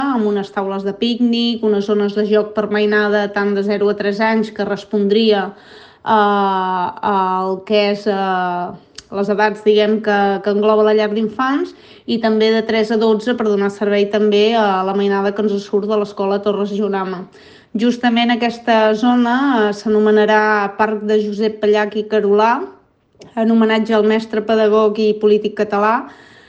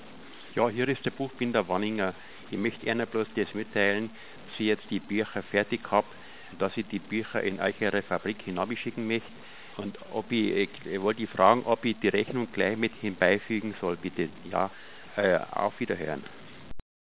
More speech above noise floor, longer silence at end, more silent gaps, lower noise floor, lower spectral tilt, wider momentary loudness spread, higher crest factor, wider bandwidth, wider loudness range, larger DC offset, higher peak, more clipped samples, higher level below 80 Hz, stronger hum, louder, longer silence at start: first, 31 dB vs 19 dB; first, 0.35 s vs 0.15 s; neither; about the same, -46 dBFS vs -48 dBFS; second, -6 dB/octave vs -9.5 dB/octave; second, 7 LU vs 13 LU; second, 14 dB vs 24 dB; first, 7.8 kHz vs 4 kHz; about the same, 3 LU vs 5 LU; second, under 0.1% vs 0.4%; first, -2 dBFS vs -6 dBFS; neither; about the same, -60 dBFS vs -62 dBFS; neither; first, -16 LUFS vs -29 LUFS; about the same, 0 s vs 0 s